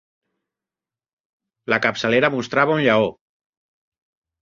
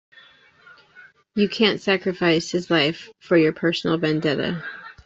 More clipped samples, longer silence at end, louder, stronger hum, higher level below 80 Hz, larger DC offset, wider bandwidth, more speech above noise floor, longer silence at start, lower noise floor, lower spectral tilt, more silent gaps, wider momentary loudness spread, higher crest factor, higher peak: neither; first, 1.3 s vs 0.15 s; about the same, -19 LUFS vs -21 LUFS; neither; about the same, -62 dBFS vs -60 dBFS; neither; about the same, 7.6 kHz vs 8 kHz; first, over 72 dB vs 31 dB; first, 1.7 s vs 0.95 s; first, under -90 dBFS vs -52 dBFS; about the same, -5.5 dB/octave vs -5.5 dB/octave; neither; second, 6 LU vs 10 LU; about the same, 22 dB vs 18 dB; about the same, -2 dBFS vs -4 dBFS